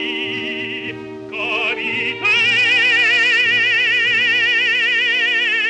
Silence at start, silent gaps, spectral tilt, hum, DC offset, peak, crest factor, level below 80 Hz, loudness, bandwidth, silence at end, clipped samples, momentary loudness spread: 0 s; none; -2 dB/octave; none; under 0.1%; -6 dBFS; 12 dB; -62 dBFS; -14 LUFS; 11 kHz; 0 s; under 0.1%; 12 LU